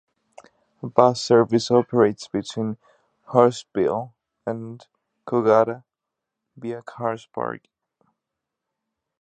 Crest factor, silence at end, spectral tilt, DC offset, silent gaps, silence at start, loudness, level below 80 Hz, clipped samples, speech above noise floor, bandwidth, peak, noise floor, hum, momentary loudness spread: 22 dB; 1.65 s; -6 dB/octave; under 0.1%; none; 0.85 s; -22 LUFS; -66 dBFS; under 0.1%; 63 dB; 9.2 kHz; 0 dBFS; -84 dBFS; none; 18 LU